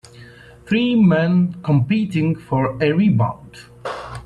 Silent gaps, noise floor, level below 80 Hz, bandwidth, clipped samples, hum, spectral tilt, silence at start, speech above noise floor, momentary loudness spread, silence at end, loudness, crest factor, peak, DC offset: none; -42 dBFS; -50 dBFS; 10 kHz; under 0.1%; none; -8.5 dB/octave; 0.15 s; 25 dB; 15 LU; 0.05 s; -18 LUFS; 14 dB; -4 dBFS; under 0.1%